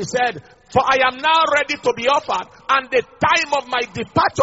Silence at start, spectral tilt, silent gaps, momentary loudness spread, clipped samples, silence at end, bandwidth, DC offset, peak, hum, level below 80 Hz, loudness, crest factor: 0 s; -1.5 dB/octave; none; 7 LU; under 0.1%; 0 s; 8 kHz; under 0.1%; -2 dBFS; none; -52 dBFS; -18 LUFS; 16 dB